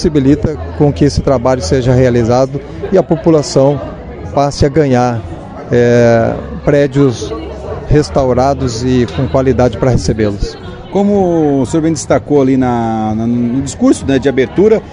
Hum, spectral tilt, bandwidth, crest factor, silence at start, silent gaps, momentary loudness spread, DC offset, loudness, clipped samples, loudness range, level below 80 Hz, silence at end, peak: none; -7 dB/octave; 10.5 kHz; 12 dB; 0 s; none; 10 LU; under 0.1%; -12 LUFS; 0.3%; 1 LU; -30 dBFS; 0 s; 0 dBFS